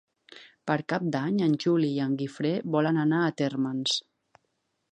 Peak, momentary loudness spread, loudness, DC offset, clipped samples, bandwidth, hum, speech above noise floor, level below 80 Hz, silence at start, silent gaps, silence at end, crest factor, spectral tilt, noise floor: -10 dBFS; 6 LU; -27 LUFS; under 0.1%; under 0.1%; 9.4 kHz; none; 51 dB; -76 dBFS; 0.3 s; none; 0.95 s; 18 dB; -6 dB/octave; -77 dBFS